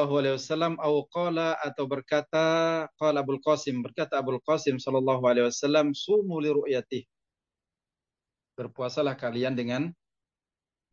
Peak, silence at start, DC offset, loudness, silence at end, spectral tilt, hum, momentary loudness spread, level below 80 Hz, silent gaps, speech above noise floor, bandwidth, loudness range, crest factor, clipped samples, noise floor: -12 dBFS; 0 s; under 0.1%; -27 LUFS; 1 s; -5.5 dB/octave; none; 8 LU; -76 dBFS; none; over 63 dB; 7.6 kHz; 7 LU; 16 dB; under 0.1%; under -90 dBFS